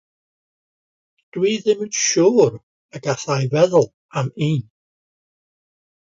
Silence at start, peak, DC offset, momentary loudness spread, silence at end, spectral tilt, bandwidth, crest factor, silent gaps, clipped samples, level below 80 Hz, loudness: 1.35 s; -2 dBFS; under 0.1%; 11 LU; 1.55 s; -5 dB/octave; 7.8 kHz; 20 dB; 2.63-2.89 s, 3.94-4.09 s; under 0.1%; -62 dBFS; -19 LUFS